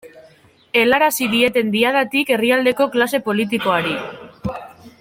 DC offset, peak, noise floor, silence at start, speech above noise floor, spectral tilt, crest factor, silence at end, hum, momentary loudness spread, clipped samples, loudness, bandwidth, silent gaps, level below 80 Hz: under 0.1%; -2 dBFS; -50 dBFS; 0.05 s; 33 dB; -4 dB/octave; 16 dB; 0.1 s; none; 14 LU; under 0.1%; -17 LUFS; 16.5 kHz; none; -54 dBFS